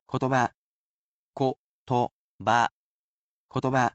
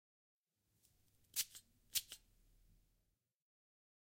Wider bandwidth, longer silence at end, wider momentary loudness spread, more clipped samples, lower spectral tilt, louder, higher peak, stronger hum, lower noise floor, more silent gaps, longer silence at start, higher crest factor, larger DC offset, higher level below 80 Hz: second, 8.4 kHz vs 16.5 kHz; second, 0.05 s vs 1.85 s; second, 10 LU vs 16 LU; neither; first, -6 dB/octave vs 2.5 dB/octave; first, -27 LUFS vs -44 LUFS; first, -10 dBFS vs -22 dBFS; neither; first, under -90 dBFS vs -85 dBFS; first, 0.55-1.33 s, 1.58-1.86 s, 2.11-2.39 s, 2.71-3.49 s vs none; second, 0.1 s vs 1.35 s; second, 20 dB vs 32 dB; neither; first, -64 dBFS vs -78 dBFS